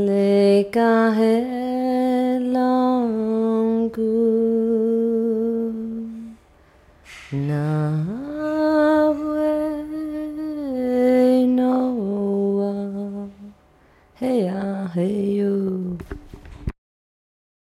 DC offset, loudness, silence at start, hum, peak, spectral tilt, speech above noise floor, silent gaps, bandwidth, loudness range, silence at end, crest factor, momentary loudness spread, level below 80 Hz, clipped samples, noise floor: under 0.1%; -21 LUFS; 0 s; none; -8 dBFS; -8 dB/octave; 36 dB; none; 12.5 kHz; 6 LU; 1.05 s; 14 dB; 14 LU; -48 dBFS; under 0.1%; -54 dBFS